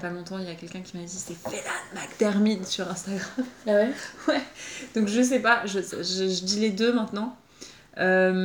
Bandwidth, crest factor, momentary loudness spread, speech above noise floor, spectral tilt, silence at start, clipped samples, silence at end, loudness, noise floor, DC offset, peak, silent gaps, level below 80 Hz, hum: over 20 kHz; 20 dB; 15 LU; 22 dB; -4 dB/octave; 0 s; under 0.1%; 0 s; -26 LUFS; -48 dBFS; under 0.1%; -6 dBFS; none; -66 dBFS; none